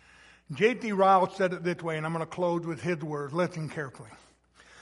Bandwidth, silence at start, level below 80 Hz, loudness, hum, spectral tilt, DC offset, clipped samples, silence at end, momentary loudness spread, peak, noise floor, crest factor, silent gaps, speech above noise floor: 11.5 kHz; 0.5 s; -68 dBFS; -28 LUFS; none; -6.5 dB/octave; under 0.1%; under 0.1%; 0 s; 14 LU; -10 dBFS; -58 dBFS; 20 dB; none; 30 dB